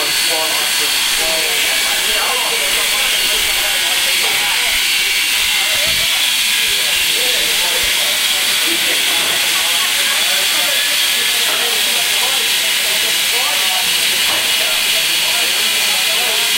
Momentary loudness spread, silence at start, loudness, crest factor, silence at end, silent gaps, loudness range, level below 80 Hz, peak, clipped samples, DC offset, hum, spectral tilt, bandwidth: 1 LU; 0 s; -12 LUFS; 14 dB; 0 s; none; 0 LU; -46 dBFS; -2 dBFS; under 0.1%; under 0.1%; none; 2 dB/octave; 16 kHz